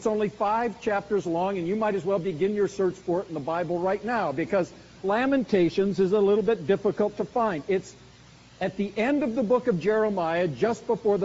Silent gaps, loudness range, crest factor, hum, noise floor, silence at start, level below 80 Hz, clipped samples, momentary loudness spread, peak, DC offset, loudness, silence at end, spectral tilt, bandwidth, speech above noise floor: none; 3 LU; 16 dB; none; -51 dBFS; 0 s; -58 dBFS; under 0.1%; 6 LU; -10 dBFS; under 0.1%; -26 LUFS; 0 s; -5.5 dB/octave; 8 kHz; 26 dB